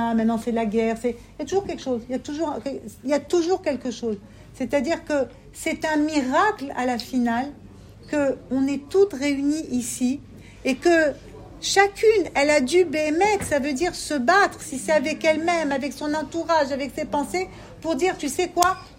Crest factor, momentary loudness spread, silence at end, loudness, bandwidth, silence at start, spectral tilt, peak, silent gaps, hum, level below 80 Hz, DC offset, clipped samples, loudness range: 20 dB; 11 LU; 0.05 s; -23 LUFS; 16 kHz; 0 s; -4 dB/octave; -2 dBFS; none; none; -50 dBFS; under 0.1%; under 0.1%; 5 LU